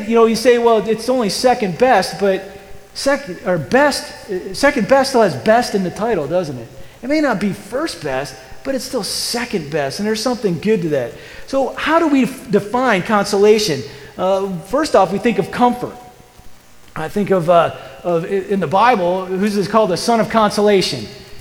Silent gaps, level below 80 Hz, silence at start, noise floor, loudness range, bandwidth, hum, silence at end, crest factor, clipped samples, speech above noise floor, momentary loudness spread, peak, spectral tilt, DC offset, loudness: none; -46 dBFS; 0 s; -39 dBFS; 5 LU; 19.5 kHz; none; 0 s; 16 dB; under 0.1%; 23 dB; 12 LU; 0 dBFS; -4.5 dB/octave; under 0.1%; -16 LUFS